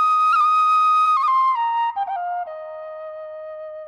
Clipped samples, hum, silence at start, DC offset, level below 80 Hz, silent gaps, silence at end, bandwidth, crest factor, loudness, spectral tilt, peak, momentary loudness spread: under 0.1%; none; 0 s; under 0.1%; -70 dBFS; none; 0 s; 10.5 kHz; 10 dB; -18 LUFS; 0.5 dB/octave; -10 dBFS; 18 LU